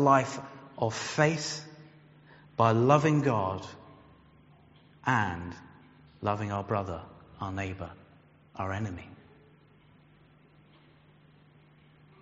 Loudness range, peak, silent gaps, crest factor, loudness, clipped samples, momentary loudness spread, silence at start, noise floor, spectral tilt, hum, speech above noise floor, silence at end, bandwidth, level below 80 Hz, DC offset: 15 LU; -8 dBFS; none; 24 dB; -30 LUFS; under 0.1%; 22 LU; 0 s; -60 dBFS; -5.5 dB/octave; none; 32 dB; 3.05 s; 8 kHz; -62 dBFS; under 0.1%